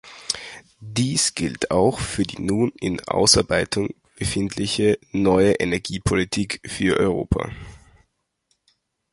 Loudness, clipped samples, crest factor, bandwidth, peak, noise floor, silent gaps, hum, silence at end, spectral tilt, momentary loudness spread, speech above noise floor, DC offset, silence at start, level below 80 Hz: -21 LUFS; under 0.1%; 22 dB; 11.5 kHz; 0 dBFS; -71 dBFS; none; none; 1.35 s; -4 dB/octave; 11 LU; 49 dB; under 0.1%; 0.05 s; -40 dBFS